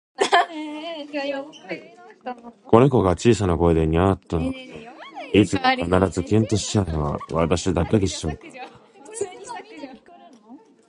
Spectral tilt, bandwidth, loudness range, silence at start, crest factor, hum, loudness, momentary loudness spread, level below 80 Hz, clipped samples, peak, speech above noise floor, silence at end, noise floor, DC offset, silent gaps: -6 dB/octave; 11 kHz; 6 LU; 0.2 s; 22 dB; none; -21 LUFS; 20 LU; -38 dBFS; under 0.1%; 0 dBFS; 27 dB; 0.3 s; -48 dBFS; under 0.1%; none